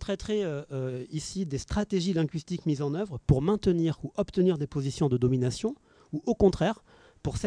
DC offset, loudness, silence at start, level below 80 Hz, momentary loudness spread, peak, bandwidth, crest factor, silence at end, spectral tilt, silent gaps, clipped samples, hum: under 0.1%; -29 LUFS; 0 s; -46 dBFS; 10 LU; -10 dBFS; 10.5 kHz; 18 dB; 0 s; -7 dB/octave; none; under 0.1%; none